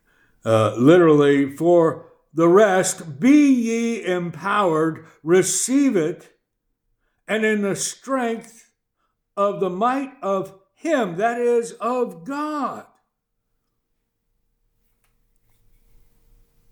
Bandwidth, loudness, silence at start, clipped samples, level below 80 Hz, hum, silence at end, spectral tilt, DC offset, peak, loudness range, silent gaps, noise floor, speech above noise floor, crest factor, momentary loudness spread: 18.5 kHz; -19 LUFS; 0.45 s; under 0.1%; -66 dBFS; none; 3.9 s; -5 dB/octave; under 0.1%; -2 dBFS; 10 LU; none; -75 dBFS; 56 dB; 20 dB; 13 LU